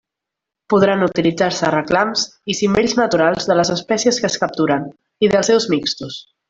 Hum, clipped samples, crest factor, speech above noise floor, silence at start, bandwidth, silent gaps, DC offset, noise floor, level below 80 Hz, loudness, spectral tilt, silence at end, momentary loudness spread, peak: none; under 0.1%; 16 dB; 66 dB; 0.7 s; 8 kHz; none; under 0.1%; -83 dBFS; -52 dBFS; -17 LUFS; -4 dB/octave; 0.3 s; 6 LU; -2 dBFS